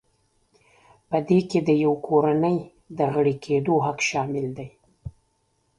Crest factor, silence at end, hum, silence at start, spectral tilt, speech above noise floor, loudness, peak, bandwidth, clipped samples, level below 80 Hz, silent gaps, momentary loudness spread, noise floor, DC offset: 18 dB; 0.7 s; none; 1.1 s; -6.5 dB/octave; 47 dB; -23 LUFS; -6 dBFS; 11.5 kHz; under 0.1%; -58 dBFS; none; 21 LU; -69 dBFS; under 0.1%